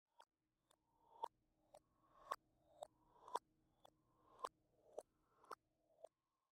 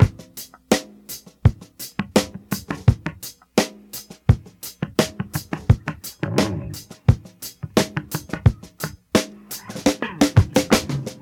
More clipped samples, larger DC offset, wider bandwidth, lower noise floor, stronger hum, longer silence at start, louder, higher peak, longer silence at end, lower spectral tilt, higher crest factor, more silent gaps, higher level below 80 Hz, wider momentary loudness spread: neither; neither; second, 14.5 kHz vs 19 kHz; first, -84 dBFS vs -41 dBFS; neither; first, 0.2 s vs 0 s; second, -56 LUFS vs -22 LUFS; second, -26 dBFS vs 0 dBFS; first, 0.45 s vs 0.1 s; second, -2 dB/octave vs -5.5 dB/octave; first, 34 dB vs 22 dB; neither; second, under -90 dBFS vs -36 dBFS; about the same, 15 LU vs 16 LU